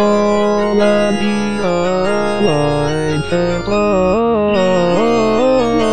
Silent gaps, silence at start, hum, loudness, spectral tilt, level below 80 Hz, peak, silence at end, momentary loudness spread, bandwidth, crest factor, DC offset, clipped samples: none; 0 s; none; -14 LUFS; -6 dB/octave; -38 dBFS; -2 dBFS; 0 s; 4 LU; 10 kHz; 12 dB; 4%; under 0.1%